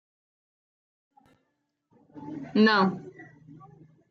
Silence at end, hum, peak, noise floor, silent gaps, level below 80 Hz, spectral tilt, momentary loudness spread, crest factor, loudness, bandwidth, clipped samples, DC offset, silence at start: 0.85 s; none; -10 dBFS; -78 dBFS; none; -74 dBFS; -7 dB/octave; 24 LU; 20 dB; -23 LUFS; 6.4 kHz; under 0.1%; under 0.1%; 2.15 s